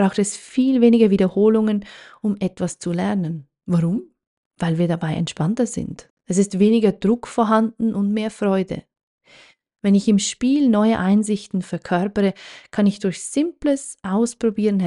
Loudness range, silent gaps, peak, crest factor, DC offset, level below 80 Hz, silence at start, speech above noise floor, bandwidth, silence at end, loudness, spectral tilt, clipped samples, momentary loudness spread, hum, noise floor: 4 LU; 4.27-4.51 s, 6.10-6.17 s, 9.03-9.18 s; -2 dBFS; 16 dB; under 0.1%; -54 dBFS; 0 s; 32 dB; 11.5 kHz; 0 s; -20 LUFS; -6 dB/octave; under 0.1%; 10 LU; none; -51 dBFS